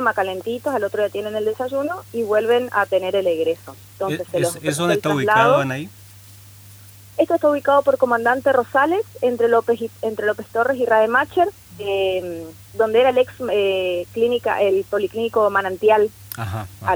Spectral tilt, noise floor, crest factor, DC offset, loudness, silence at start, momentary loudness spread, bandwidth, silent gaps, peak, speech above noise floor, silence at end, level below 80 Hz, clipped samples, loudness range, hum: -5 dB/octave; -43 dBFS; 16 dB; under 0.1%; -19 LUFS; 0 s; 10 LU; over 20 kHz; none; -4 dBFS; 24 dB; 0 s; -58 dBFS; under 0.1%; 3 LU; none